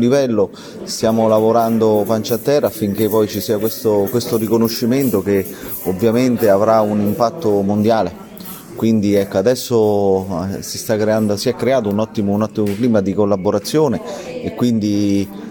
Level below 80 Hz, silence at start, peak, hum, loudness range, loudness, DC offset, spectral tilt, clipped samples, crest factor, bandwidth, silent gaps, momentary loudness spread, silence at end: -54 dBFS; 0 s; 0 dBFS; none; 2 LU; -16 LUFS; under 0.1%; -6 dB/octave; under 0.1%; 16 dB; 17.5 kHz; none; 9 LU; 0 s